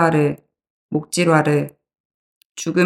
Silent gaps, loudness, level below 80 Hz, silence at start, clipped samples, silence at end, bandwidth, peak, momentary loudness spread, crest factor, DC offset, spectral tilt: 0.70-0.89 s, 2.00-2.55 s; -19 LUFS; -62 dBFS; 0 s; under 0.1%; 0 s; 13.5 kHz; -2 dBFS; 17 LU; 18 dB; under 0.1%; -5.5 dB/octave